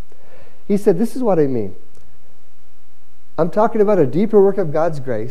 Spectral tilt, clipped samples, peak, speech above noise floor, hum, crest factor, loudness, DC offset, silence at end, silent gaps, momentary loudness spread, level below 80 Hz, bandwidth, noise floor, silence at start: -8.5 dB/octave; under 0.1%; -2 dBFS; 40 dB; none; 16 dB; -17 LUFS; 10%; 0 s; none; 10 LU; -56 dBFS; 13.5 kHz; -56 dBFS; 0.7 s